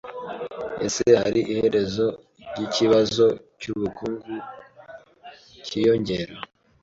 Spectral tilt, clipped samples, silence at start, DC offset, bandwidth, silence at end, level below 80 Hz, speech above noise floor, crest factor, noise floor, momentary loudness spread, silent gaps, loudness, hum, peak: -5 dB/octave; under 0.1%; 0.05 s; under 0.1%; 7.8 kHz; 0.35 s; -56 dBFS; 25 dB; 20 dB; -47 dBFS; 19 LU; none; -23 LUFS; none; -4 dBFS